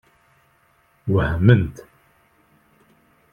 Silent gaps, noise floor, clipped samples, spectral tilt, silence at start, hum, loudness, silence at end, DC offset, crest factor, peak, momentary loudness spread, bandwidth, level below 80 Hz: none; -60 dBFS; under 0.1%; -9 dB/octave; 1.05 s; none; -19 LUFS; 1.55 s; under 0.1%; 22 dB; 0 dBFS; 14 LU; 6.8 kHz; -42 dBFS